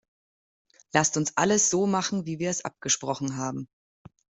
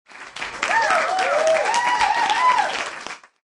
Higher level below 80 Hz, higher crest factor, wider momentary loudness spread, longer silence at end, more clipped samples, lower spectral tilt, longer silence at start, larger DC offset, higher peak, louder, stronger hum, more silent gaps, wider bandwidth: second, -66 dBFS vs -58 dBFS; first, 24 dB vs 16 dB; second, 11 LU vs 16 LU; first, 0.75 s vs 0.4 s; neither; first, -3.5 dB/octave vs -0.5 dB/octave; first, 0.95 s vs 0.1 s; neither; about the same, -4 dBFS vs -4 dBFS; second, -26 LUFS vs -19 LUFS; neither; neither; second, 8.2 kHz vs 11.5 kHz